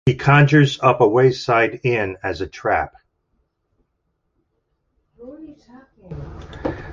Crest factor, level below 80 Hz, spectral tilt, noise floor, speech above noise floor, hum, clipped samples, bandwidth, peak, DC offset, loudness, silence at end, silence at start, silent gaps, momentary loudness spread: 18 dB; -44 dBFS; -7 dB/octave; -72 dBFS; 54 dB; none; under 0.1%; 7.4 kHz; -2 dBFS; under 0.1%; -17 LUFS; 0 s; 0.05 s; none; 22 LU